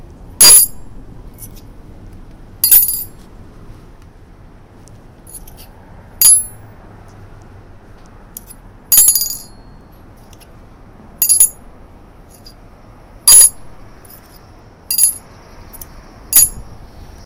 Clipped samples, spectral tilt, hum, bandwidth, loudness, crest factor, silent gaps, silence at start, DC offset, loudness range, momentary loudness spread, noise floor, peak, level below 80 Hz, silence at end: 0.5%; 1 dB/octave; none; over 20 kHz; -8 LUFS; 16 dB; none; 0.4 s; under 0.1%; 5 LU; 17 LU; -40 dBFS; 0 dBFS; -40 dBFS; 0.5 s